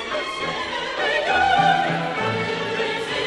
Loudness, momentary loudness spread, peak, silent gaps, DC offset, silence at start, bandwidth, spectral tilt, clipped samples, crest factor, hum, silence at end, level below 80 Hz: -21 LUFS; 8 LU; -6 dBFS; none; under 0.1%; 0 s; 11.5 kHz; -4 dB/octave; under 0.1%; 16 dB; none; 0 s; -52 dBFS